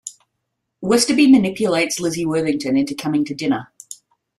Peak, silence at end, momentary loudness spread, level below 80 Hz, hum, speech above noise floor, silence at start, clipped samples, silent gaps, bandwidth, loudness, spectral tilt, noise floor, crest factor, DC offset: -2 dBFS; 0.45 s; 23 LU; -58 dBFS; none; 59 dB; 0.05 s; under 0.1%; none; 13.5 kHz; -18 LUFS; -4.5 dB/octave; -76 dBFS; 18 dB; under 0.1%